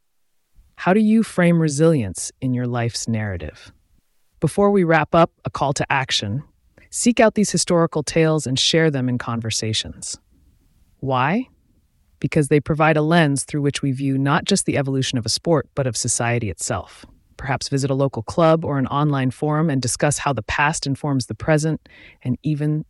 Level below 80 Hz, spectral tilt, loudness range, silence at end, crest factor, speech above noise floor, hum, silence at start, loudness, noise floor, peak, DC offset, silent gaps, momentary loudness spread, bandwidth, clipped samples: -48 dBFS; -5 dB/octave; 3 LU; 0.05 s; 18 dB; 46 dB; none; 0.8 s; -20 LUFS; -65 dBFS; -2 dBFS; under 0.1%; none; 10 LU; 12 kHz; under 0.1%